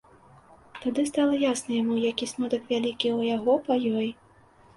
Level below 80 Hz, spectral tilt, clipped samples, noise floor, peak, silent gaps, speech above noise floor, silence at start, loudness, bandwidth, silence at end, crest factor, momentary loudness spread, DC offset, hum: -64 dBFS; -4 dB/octave; under 0.1%; -56 dBFS; -10 dBFS; none; 31 dB; 0.75 s; -26 LUFS; 11.5 kHz; 0.65 s; 16 dB; 6 LU; under 0.1%; none